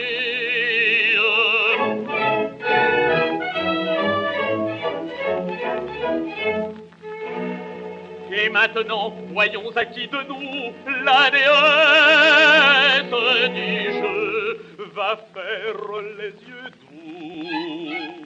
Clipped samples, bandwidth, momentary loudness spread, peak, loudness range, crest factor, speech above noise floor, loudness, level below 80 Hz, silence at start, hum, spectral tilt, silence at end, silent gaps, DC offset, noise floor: under 0.1%; 8.2 kHz; 20 LU; -2 dBFS; 13 LU; 20 dB; 22 dB; -18 LUFS; -62 dBFS; 0 s; none; -4 dB/octave; 0 s; none; under 0.1%; -40 dBFS